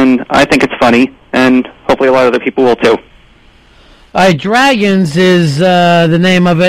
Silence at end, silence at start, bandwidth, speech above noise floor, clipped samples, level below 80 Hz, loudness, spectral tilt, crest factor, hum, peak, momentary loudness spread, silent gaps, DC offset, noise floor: 0 s; 0 s; 15 kHz; 34 dB; under 0.1%; -40 dBFS; -9 LUFS; -6 dB/octave; 10 dB; none; 0 dBFS; 4 LU; none; under 0.1%; -42 dBFS